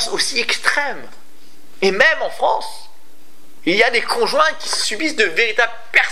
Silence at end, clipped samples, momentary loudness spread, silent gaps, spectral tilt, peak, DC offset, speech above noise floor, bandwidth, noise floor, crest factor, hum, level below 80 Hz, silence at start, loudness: 0 s; under 0.1%; 8 LU; none; -1.5 dB/octave; 0 dBFS; 5%; 34 dB; 16 kHz; -51 dBFS; 18 dB; none; -64 dBFS; 0 s; -16 LUFS